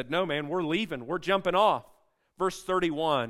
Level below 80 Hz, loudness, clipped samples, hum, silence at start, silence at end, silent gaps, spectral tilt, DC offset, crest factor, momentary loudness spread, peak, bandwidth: -60 dBFS; -28 LUFS; under 0.1%; none; 0 s; 0 s; none; -5 dB/octave; under 0.1%; 18 dB; 8 LU; -10 dBFS; 14.5 kHz